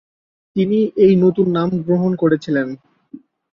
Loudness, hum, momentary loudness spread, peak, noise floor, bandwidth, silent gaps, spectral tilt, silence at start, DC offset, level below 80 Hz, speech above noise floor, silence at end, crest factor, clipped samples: -16 LUFS; none; 11 LU; -2 dBFS; -42 dBFS; 7 kHz; none; -9 dB/octave; 0.55 s; under 0.1%; -56 dBFS; 26 dB; 0.35 s; 14 dB; under 0.1%